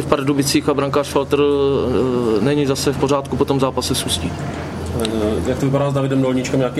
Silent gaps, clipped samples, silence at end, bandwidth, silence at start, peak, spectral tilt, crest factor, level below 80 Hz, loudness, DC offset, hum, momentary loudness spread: none; under 0.1%; 0 s; 14.5 kHz; 0 s; 0 dBFS; -5.5 dB/octave; 18 dB; -38 dBFS; -18 LUFS; under 0.1%; none; 5 LU